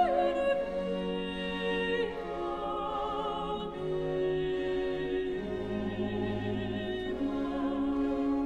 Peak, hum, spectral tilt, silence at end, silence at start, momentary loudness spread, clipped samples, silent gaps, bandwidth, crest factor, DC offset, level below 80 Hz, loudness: -16 dBFS; none; -7 dB/octave; 0 s; 0 s; 5 LU; under 0.1%; none; 9.8 kHz; 16 dB; 0.2%; -50 dBFS; -33 LUFS